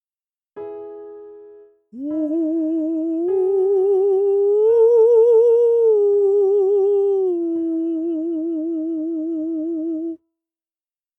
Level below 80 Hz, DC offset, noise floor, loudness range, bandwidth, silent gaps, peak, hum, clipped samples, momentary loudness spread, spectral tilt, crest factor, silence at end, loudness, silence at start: -74 dBFS; under 0.1%; under -90 dBFS; 10 LU; 3 kHz; none; -6 dBFS; none; under 0.1%; 18 LU; -8.5 dB/octave; 12 dB; 1 s; -18 LUFS; 0.55 s